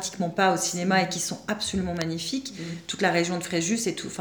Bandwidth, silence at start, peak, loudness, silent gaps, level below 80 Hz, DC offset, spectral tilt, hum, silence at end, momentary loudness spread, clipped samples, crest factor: over 20 kHz; 0 s; -8 dBFS; -26 LUFS; none; -58 dBFS; under 0.1%; -3.5 dB/octave; none; 0 s; 8 LU; under 0.1%; 20 dB